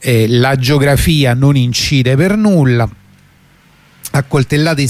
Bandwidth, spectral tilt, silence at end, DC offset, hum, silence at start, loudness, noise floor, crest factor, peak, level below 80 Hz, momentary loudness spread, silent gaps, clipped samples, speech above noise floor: 15.5 kHz; -6 dB/octave; 0 s; under 0.1%; none; 0 s; -11 LUFS; -47 dBFS; 10 dB; 0 dBFS; -30 dBFS; 6 LU; none; under 0.1%; 36 dB